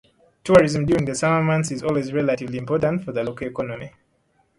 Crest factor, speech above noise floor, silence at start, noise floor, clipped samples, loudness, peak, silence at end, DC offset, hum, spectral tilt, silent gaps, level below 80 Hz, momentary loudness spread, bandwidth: 20 dB; 44 dB; 0.45 s; -65 dBFS; under 0.1%; -21 LUFS; 0 dBFS; 0.7 s; under 0.1%; none; -6 dB/octave; none; -50 dBFS; 14 LU; 11.5 kHz